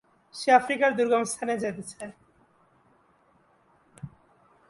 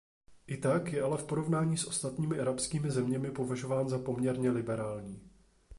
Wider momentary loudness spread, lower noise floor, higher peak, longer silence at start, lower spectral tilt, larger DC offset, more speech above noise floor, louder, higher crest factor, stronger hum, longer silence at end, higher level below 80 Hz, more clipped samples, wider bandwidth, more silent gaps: first, 24 LU vs 6 LU; first, -64 dBFS vs -56 dBFS; first, -6 dBFS vs -18 dBFS; about the same, 0.35 s vs 0.3 s; second, -4 dB/octave vs -6 dB/octave; neither; first, 39 dB vs 24 dB; first, -25 LUFS vs -33 LUFS; first, 24 dB vs 16 dB; neither; first, 0.6 s vs 0 s; second, -70 dBFS vs -62 dBFS; neither; about the same, 11.5 kHz vs 11.5 kHz; neither